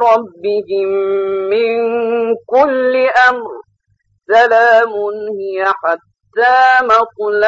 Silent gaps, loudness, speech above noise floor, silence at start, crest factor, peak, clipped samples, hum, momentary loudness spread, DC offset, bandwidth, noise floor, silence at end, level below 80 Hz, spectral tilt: none; -13 LUFS; 49 dB; 0 s; 12 dB; -2 dBFS; under 0.1%; none; 11 LU; under 0.1%; 7.8 kHz; -61 dBFS; 0 s; -58 dBFS; -4 dB/octave